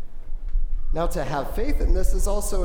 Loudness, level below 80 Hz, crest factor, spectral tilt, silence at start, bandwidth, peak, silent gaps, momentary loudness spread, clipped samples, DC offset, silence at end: -28 LUFS; -22 dBFS; 12 dB; -5.5 dB/octave; 0 s; 16 kHz; -8 dBFS; none; 9 LU; under 0.1%; under 0.1%; 0 s